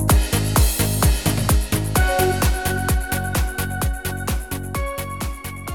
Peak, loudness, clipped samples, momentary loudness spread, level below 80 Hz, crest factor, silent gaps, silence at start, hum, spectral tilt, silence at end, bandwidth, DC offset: -4 dBFS; -21 LUFS; under 0.1%; 9 LU; -24 dBFS; 16 dB; none; 0 s; none; -4.5 dB/octave; 0 s; 19 kHz; 0.5%